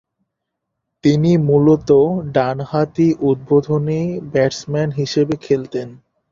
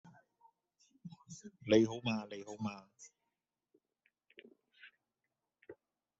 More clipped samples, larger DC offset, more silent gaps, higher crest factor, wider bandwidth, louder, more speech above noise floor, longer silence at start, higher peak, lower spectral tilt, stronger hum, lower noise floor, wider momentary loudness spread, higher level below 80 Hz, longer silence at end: neither; neither; neither; second, 16 dB vs 26 dB; about the same, 7.6 kHz vs 8 kHz; first, -17 LUFS vs -36 LUFS; first, 62 dB vs 54 dB; first, 1.05 s vs 0.05 s; first, -2 dBFS vs -14 dBFS; first, -7.5 dB/octave vs -5 dB/octave; neither; second, -78 dBFS vs -90 dBFS; second, 8 LU vs 28 LU; first, -50 dBFS vs -76 dBFS; about the same, 0.35 s vs 0.45 s